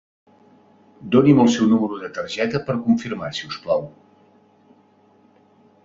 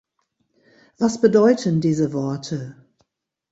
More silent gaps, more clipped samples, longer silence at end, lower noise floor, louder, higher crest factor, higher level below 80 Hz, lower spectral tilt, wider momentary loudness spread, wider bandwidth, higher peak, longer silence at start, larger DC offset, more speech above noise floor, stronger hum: neither; neither; first, 1.95 s vs 0.8 s; second, -56 dBFS vs -73 dBFS; about the same, -20 LUFS vs -20 LUFS; about the same, 20 dB vs 20 dB; about the same, -58 dBFS vs -62 dBFS; about the same, -6.5 dB/octave vs -7 dB/octave; about the same, 14 LU vs 15 LU; about the same, 7.6 kHz vs 8 kHz; about the same, -2 dBFS vs -2 dBFS; about the same, 1 s vs 1 s; neither; second, 37 dB vs 54 dB; neither